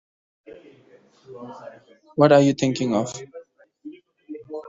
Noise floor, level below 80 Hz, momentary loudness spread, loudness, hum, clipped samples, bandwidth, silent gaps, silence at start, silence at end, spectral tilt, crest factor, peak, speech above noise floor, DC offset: -54 dBFS; -66 dBFS; 28 LU; -19 LUFS; none; under 0.1%; 7.8 kHz; none; 0.5 s; 0 s; -6 dB/octave; 22 dB; -4 dBFS; 34 dB; under 0.1%